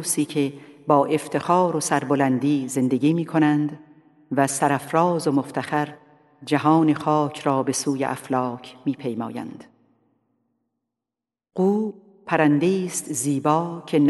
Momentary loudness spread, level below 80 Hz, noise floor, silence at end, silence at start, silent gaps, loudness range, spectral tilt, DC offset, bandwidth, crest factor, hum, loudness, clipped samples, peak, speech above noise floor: 10 LU; -72 dBFS; -88 dBFS; 0 s; 0 s; none; 8 LU; -5.5 dB/octave; under 0.1%; 12 kHz; 20 dB; none; -22 LUFS; under 0.1%; -4 dBFS; 67 dB